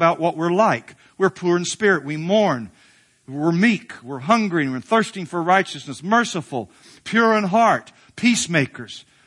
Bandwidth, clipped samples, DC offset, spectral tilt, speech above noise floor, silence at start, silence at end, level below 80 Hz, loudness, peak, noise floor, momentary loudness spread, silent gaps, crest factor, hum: 11.5 kHz; under 0.1%; under 0.1%; -5 dB/octave; 35 dB; 0 s; 0.25 s; -66 dBFS; -20 LUFS; 0 dBFS; -55 dBFS; 13 LU; none; 20 dB; none